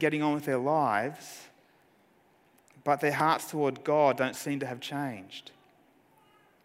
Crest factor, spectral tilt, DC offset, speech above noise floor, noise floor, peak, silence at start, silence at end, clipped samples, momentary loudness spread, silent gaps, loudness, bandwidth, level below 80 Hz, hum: 20 dB; -5.5 dB/octave; under 0.1%; 36 dB; -65 dBFS; -12 dBFS; 0 s; 1.25 s; under 0.1%; 18 LU; none; -29 LUFS; 16 kHz; -80 dBFS; none